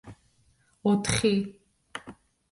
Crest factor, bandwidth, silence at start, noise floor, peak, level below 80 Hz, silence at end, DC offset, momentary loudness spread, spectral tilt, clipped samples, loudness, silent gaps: 22 dB; 11.5 kHz; 0.05 s; -66 dBFS; -8 dBFS; -52 dBFS; 0.4 s; under 0.1%; 18 LU; -4.5 dB/octave; under 0.1%; -26 LUFS; none